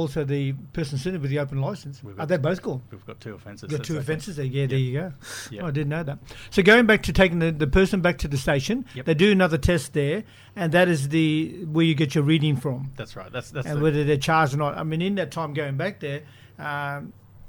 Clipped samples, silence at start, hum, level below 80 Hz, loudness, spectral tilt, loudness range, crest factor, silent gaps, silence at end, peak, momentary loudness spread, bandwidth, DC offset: under 0.1%; 0 s; none; -40 dBFS; -23 LUFS; -6 dB/octave; 8 LU; 18 dB; none; 0 s; -6 dBFS; 16 LU; 19 kHz; under 0.1%